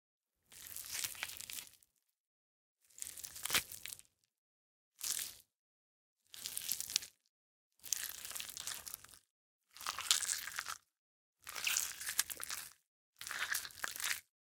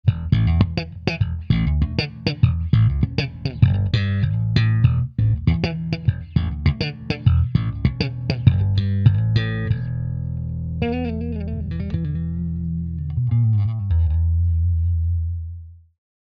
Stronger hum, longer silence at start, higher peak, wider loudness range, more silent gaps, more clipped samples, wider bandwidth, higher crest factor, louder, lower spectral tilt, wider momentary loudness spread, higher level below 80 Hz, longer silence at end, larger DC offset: neither; first, 0.5 s vs 0.05 s; second, -4 dBFS vs 0 dBFS; about the same, 6 LU vs 4 LU; first, 2.20-2.77 s, 4.38-4.92 s, 5.55-6.16 s, 7.29-7.71 s, 9.30-9.60 s, 10.98-11.33 s, 12.87-13.13 s vs none; neither; first, 18 kHz vs 6.2 kHz; first, 40 dB vs 20 dB; second, -40 LUFS vs -21 LUFS; second, 2 dB/octave vs -8.5 dB/octave; first, 17 LU vs 9 LU; second, -76 dBFS vs -30 dBFS; second, 0.3 s vs 0.6 s; neither